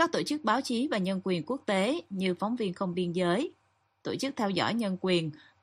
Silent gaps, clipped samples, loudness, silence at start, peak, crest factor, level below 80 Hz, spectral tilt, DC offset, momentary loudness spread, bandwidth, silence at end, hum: none; under 0.1%; -30 LUFS; 0 s; -10 dBFS; 20 dB; -72 dBFS; -5.5 dB/octave; under 0.1%; 5 LU; 13 kHz; 0.25 s; none